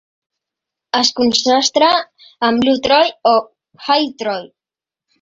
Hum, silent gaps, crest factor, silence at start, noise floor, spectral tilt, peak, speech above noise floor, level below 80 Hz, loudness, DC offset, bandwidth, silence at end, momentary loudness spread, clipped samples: none; none; 16 dB; 0.95 s; -89 dBFS; -2 dB/octave; 0 dBFS; 74 dB; -56 dBFS; -15 LUFS; under 0.1%; 8 kHz; 0.75 s; 10 LU; under 0.1%